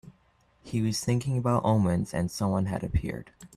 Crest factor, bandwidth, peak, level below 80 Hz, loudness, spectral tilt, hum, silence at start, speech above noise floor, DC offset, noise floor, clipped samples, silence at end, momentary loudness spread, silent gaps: 16 dB; 14 kHz; -12 dBFS; -46 dBFS; -28 LUFS; -6.5 dB/octave; none; 0.05 s; 38 dB; under 0.1%; -65 dBFS; under 0.1%; 0.1 s; 8 LU; none